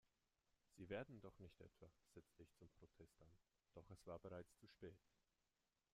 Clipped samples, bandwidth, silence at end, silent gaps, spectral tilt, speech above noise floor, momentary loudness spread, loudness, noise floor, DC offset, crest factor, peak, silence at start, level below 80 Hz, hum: under 0.1%; 14.5 kHz; 0.95 s; none; -6.5 dB/octave; over 29 dB; 14 LU; -60 LUFS; under -90 dBFS; under 0.1%; 24 dB; -40 dBFS; 0.05 s; -82 dBFS; none